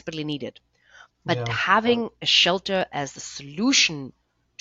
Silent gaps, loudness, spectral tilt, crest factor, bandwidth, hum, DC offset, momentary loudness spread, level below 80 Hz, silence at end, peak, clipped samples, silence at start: none; -22 LUFS; -2.5 dB/octave; 22 dB; 7.8 kHz; none; under 0.1%; 18 LU; -60 dBFS; 0.5 s; -4 dBFS; under 0.1%; 0.05 s